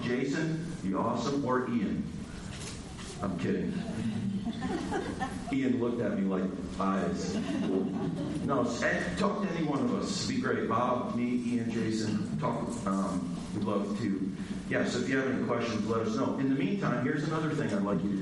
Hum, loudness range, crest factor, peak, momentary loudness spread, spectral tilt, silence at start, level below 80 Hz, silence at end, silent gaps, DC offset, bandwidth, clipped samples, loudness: none; 3 LU; 18 dB; -14 dBFS; 5 LU; -6 dB/octave; 0 s; -54 dBFS; 0 s; none; under 0.1%; 11.5 kHz; under 0.1%; -32 LUFS